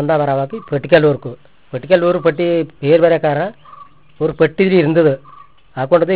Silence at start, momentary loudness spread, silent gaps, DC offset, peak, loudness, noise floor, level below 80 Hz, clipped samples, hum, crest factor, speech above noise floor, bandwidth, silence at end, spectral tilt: 0 s; 13 LU; none; 0.5%; 0 dBFS; -15 LUFS; -41 dBFS; -52 dBFS; under 0.1%; none; 14 dB; 27 dB; 4 kHz; 0 s; -11 dB/octave